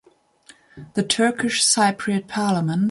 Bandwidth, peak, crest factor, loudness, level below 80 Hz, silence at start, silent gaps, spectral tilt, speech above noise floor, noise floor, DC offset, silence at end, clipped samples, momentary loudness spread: 11.5 kHz; -6 dBFS; 16 dB; -20 LUFS; -62 dBFS; 0.75 s; none; -3.5 dB/octave; 32 dB; -52 dBFS; under 0.1%; 0 s; under 0.1%; 9 LU